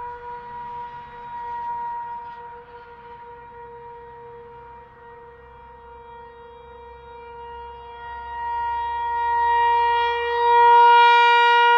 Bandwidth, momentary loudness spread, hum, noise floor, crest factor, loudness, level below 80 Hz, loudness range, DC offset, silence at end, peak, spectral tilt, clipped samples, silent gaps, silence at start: 7 kHz; 28 LU; none; -44 dBFS; 16 dB; -18 LUFS; -54 dBFS; 25 LU; under 0.1%; 0 s; -6 dBFS; -2.5 dB/octave; under 0.1%; none; 0 s